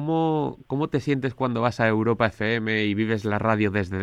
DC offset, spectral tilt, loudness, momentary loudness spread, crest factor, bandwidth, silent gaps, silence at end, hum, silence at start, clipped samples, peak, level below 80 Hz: under 0.1%; -7.5 dB/octave; -24 LUFS; 4 LU; 18 dB; 10.5 kHz; none; 0 s; none; 0 s; under 0.1%; -6 dBFS; -56 dBFS